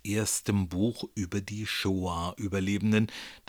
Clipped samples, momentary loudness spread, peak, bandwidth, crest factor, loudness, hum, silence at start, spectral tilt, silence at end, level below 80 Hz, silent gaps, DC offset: under 0.1%; 7 LU; -14 dBFS; over 20 kHz; 16 dB; -30 LUFS; none; 0.05 s; -4.5 dB/octave; 0.1 s; -54 dBFS; none; under 0.1%